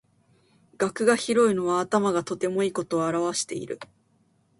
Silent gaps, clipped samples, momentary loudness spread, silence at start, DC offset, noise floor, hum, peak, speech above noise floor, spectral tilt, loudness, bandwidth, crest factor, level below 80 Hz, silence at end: none; under 0.1%; 10 LU; 0.8 s; under 0.1%; -65 dBFS; none; -8 dBFS; 41 dB; -4.5 dB/octave; -25 LUFS; 11.5 kHz; 18 dB; -68 dBFS; 0.75 s